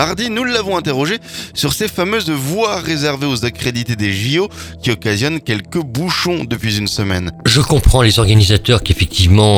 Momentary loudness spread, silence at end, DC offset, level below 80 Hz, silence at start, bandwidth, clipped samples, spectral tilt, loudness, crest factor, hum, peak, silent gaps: 8 LU; 0 s; under 0.1%; -26 dBFS; 0 s; 18 kHz; under 0.1%; -4.5 dB/octave; -15 LUFS; 14 dB; none; 0 dBFS; none